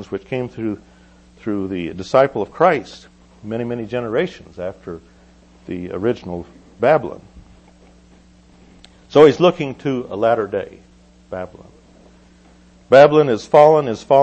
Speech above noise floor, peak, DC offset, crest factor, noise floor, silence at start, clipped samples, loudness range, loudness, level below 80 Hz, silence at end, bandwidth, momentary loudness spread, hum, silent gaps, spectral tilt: 32 dB; 0 dBFS; under 0.1%; 18 dB; -48 dBFS; 0 s; under 0.1%; 9 LU; -17 LUFS; -52 dBFS; 0 s; 8.4 kHz; 21 LU; none; none; -6.5 dB/octave